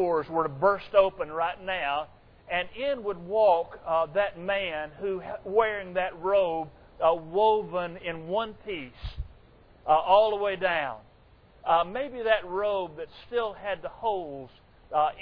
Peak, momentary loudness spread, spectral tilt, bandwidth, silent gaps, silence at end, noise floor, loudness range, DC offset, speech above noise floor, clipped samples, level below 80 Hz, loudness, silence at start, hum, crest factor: -8 dBFS; 14 LU; -8 dB/octave; 5.2 kHz; none; 0 s; -57 dBFS; 3 LU; under 0.1%; 30 dB; under 0.1%; -52 dBFS; -27 LUFS; 0 s; none; 20 dB